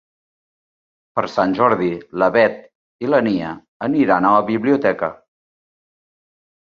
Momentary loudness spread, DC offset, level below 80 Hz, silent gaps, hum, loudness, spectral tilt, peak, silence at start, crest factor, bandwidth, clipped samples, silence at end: 11 LU; under 0.1%; -58 dBFS; 2.75-2.99 s, 3.68-3.80 s; none; -18 LUFS; -7.5 dB/octave; -2 dBFS; 1.15 s; 18 dB; 7 kHz; under 0.1%; 1.55 s